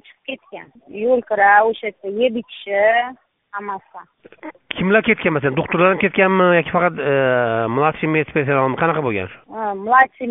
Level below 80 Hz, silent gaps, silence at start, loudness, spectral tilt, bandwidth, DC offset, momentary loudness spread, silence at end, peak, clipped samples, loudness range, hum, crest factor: -56 dBFS; none; 0.3 s; -17 LUFS; -4 dB/octave; 4 kHz; under 0.1%; 17 LU; 0 s; 0 dBFS; under 0.1%; 4 LU; none; 18 dB